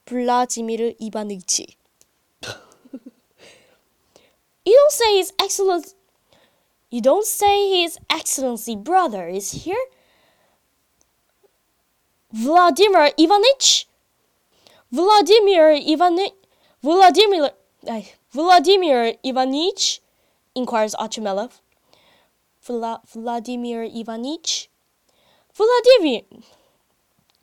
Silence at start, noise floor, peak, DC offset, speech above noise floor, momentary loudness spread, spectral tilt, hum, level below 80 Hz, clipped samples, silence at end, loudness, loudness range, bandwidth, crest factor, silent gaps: 0.1 s; -67 dBFS; -2 dBFS; under 0.1%; 50 dB; 17 LU; -2 dB/octave; none; -62 dBFS; under 0.1%; 1.25 s; -18 LUFS; 12 LU; 17.5 kHz; 18 dB; none